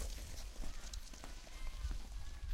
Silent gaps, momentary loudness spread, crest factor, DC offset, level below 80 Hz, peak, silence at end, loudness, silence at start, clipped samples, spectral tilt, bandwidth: none; 5 LU; 14 dB; under 0.1%; -46 dBFS; -30 dBFS; 0 s; -50 LUFS; 0 s; under 0.1%; -3.5 dB/octave; 16 kHz